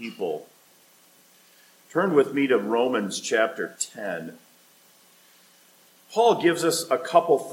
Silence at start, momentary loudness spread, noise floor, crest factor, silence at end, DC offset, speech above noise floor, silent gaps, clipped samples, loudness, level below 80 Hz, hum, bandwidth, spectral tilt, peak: 0 s; 12 LU; -57 dBFS; 22 dB; 0 s; under 0.1%; 33 dB; none; under 0.1%; -24 LUFS; -82 dBFS; none; 17 kHz; -4 dB/octave; -4 dBFS